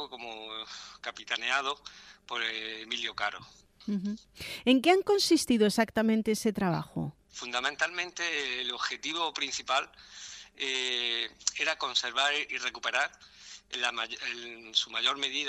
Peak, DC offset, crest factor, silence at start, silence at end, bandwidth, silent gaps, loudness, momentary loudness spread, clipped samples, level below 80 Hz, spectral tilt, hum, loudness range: -10 dBFS; under 0.1%; 22 dB; 0 s; 0 s; 15.5 kHz; none; -30 LUFS; 16 LU; under 0.1%; -66 dBFS; -3 dB/octave; none; 7 LU